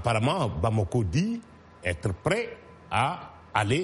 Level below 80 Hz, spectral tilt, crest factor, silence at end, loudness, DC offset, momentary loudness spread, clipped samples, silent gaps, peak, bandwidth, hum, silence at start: -48 dBFS; -6 dB/octave; 18 dB; 0 s; -28 LUFS; under 0.1%; 10 LU; under 0.1%; none; -10 dBFS; 11.5 kHz; none; 0 s